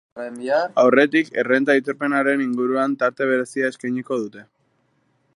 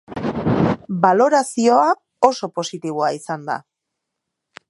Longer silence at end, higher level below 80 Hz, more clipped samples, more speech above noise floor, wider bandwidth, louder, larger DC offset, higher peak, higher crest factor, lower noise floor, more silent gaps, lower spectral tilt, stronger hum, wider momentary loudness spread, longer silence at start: second, 0.9 s vs 1.1 s; second, -78 dBFS vs -50 dBFS; neither; second, 46 dB vs 62 dB; about the same, 11.5 kHz vs 11.5 kHz; about the same, -20 LUFS vs -19 LUFS; neither; about the same, -2 dBFS vs 0 dBFS; about the same, 20 dB vs 18 dB; second, -65 dBFS vs -80 dBFS; neither; about the same, -5.5 dB/octave vs -5.5 dB/octave; neither; about the same, 11 LU vs 11 LU; about the same, 0.15 s vs 0.1 s